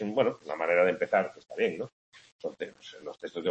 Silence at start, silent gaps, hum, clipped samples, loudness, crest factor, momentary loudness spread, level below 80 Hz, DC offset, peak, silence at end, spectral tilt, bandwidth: 0 s; 1.92-2.12 s, 2.32-2.39 s; none; under 0.1%; -30 LUFS; 20 dB; 16 LU; -76 dBFS; under 0.1%; -10 dBFS; 0 s; -6 dB/octave; 8.4 kHz